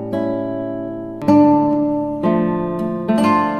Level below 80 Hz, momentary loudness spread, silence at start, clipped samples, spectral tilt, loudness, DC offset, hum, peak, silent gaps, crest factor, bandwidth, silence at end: -50 dBFS; 12 LU; 0 s; under 0.1%; -8 dB/octave; -17 LUFS; under 0.1%; none; -2 dBFS; none; 16 dB; 9.4 kHz; 0 s